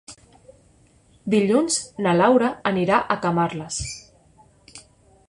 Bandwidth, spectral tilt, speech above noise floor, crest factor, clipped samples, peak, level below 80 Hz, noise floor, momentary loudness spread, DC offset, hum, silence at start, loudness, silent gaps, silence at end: 11.5 kHz; -4.5 dB/octave; 36 dB; 18 dB; under 0.1%; -4 dBFS; -52 dBFS; -56 dBFS; 12 LU; under 0.1%; none; 0.1 s; -21 LUFS; none; 0.5 s